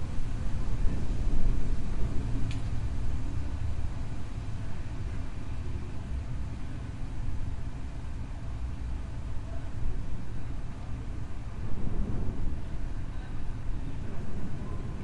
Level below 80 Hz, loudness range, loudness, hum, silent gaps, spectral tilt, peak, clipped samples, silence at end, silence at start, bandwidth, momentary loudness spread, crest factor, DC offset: -34 dBFS; 5 LU; -37 LUFS; none; none; -7.5 dB/octave; -12 dBFS; under 0.1%; 0 s; 0 s; 7.8 kHz; 6 LU; 16 dB; under 0.1%